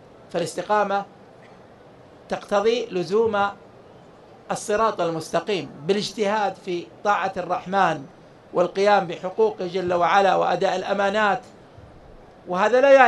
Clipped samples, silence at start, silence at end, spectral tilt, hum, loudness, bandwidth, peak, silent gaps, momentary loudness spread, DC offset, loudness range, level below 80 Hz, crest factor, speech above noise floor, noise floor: under 0.1%; 0.3 s; 0 s; -4.5 dB/octave; none; -23 LUFS; 12 kHz; 0 dBFS; none; 11 LU; under 0.1%; 4 LU; -60 dBFS; 22 dB; 27 dB; -48 dBFS